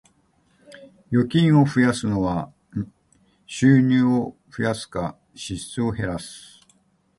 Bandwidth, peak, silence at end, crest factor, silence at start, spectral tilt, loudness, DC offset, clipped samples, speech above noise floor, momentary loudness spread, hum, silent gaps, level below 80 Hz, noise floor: 11.5 kHz; -4 dBFS; 0.8 s; 18 dB; 0.8 s; -6.5 dB/octave; -22 LUFS; under 0.1%; under 0.1%; 42 dB; 16 LU; none; none; -50 dBFS; -63 dBFS